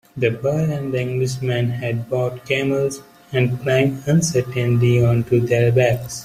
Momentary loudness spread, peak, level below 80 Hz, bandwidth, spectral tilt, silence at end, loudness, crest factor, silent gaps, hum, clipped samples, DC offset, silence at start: 7 LU; -4 dBFS; -50 dBFS; 15 kHz; -6 dB/octave; 0 s; -19 LUFS; 16 dB; none; none; under 0.1%; under 0.1%; 0.15 s